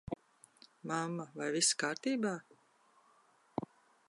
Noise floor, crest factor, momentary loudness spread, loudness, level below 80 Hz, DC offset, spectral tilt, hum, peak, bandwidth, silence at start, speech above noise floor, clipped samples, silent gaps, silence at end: -69 dBFS; 22 dB; 16 LU; -36 LUFS; -70 dBFS; under 0.1%; -2.5 dB/octave; none; -18 dBFS; 11.5 kHz; 0.1 s; 34 dB; under 0.1%; none; 0.45 s